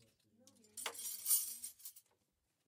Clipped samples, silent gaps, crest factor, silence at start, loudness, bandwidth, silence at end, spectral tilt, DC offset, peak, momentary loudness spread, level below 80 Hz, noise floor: under 0.1%; none; 26 dB; 0.75 s; -38 LUFS; 16 kHz; 0.7 s; 2.5 dB/octave; under 0.1%; -20 dBFS; 20 LU; under -90 dBFS; -84 dBFS